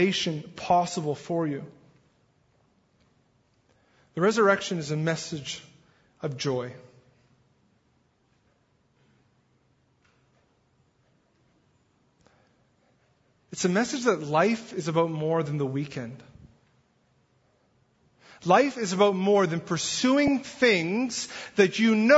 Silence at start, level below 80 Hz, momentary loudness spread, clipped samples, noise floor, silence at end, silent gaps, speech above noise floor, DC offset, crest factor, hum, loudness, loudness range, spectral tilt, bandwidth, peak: 0 s; -66 dBFS; 14 LU; under 0.1%; -68 dBFS; 0 s; none; 43 dB; under 0.1%; 22 dB; none; -26 LUFS; 13 LU; -5 dB/octave; 8 kHz; -6 dBFS